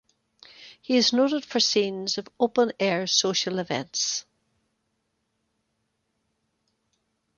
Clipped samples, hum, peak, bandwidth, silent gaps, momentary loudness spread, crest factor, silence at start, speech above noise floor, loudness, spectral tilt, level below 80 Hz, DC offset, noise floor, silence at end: under 0.1%; none; -6 dBFS; 7.4 kHz; none; 8 LU; 22 dB; 0.6 s; 51 dB; -24 LUFS; -2.5 dB/octave; -72 dBFS; under 0.1%; -76 dBFS; 3.15 s